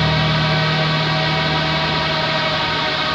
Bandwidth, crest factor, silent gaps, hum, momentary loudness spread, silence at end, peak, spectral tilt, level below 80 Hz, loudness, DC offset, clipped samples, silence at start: 8 kHz; 12 dB; none; none; 2 LU; 0 s; -6 dBFS; -5.5 dB/octave; -38 dBFS; -17 LUFS; under 0.1%; under 0.1%; 0 s